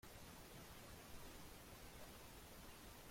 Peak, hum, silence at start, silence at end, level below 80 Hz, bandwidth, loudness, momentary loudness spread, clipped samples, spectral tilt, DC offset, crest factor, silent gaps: -44 dBFS; none; 0.05 s; 0 s; -66 dBFS; 16.5 kHz; -59 LUFS; 1 LU; under 0.1%; -3.5 dB/octave; under 0.1%; 14 dB; none